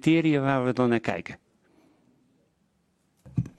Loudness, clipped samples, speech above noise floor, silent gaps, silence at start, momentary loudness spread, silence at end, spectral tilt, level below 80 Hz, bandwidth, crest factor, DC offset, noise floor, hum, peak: -25 LUFS; under 0.1%; 46 dB; none; 0.05 s; 17 LU; 0.1 s; -7.5 dB/octave; -58 dBFS; 10 kHz; 20 dB; under 0.1%; -70 dBFS; none; -8 dBFS